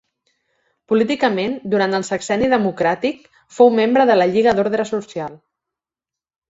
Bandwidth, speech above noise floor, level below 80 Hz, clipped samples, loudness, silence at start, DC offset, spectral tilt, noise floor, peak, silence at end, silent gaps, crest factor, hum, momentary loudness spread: 8 kHz; 72 dB; -54 dBFS; under 0.1%; -17 LUFS; 0.9 s; under 0.1%; -5.5 dB/octave; -89 dBFS; -2 dBFS; 1.15 s; none; 16 dB; none; 11 LU